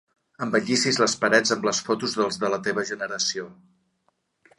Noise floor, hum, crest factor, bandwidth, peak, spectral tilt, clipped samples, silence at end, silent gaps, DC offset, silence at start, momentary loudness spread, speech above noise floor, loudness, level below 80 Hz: -71 dBFS; none; 22 dB; 11.5 kHz; -4 dBFS; -2.5 dB/octave; under 0.1%; 1.05 s; none; under 0.1%; 0.4 s; 9 LU; 47 dB; -23 LUFS; -68 dBFS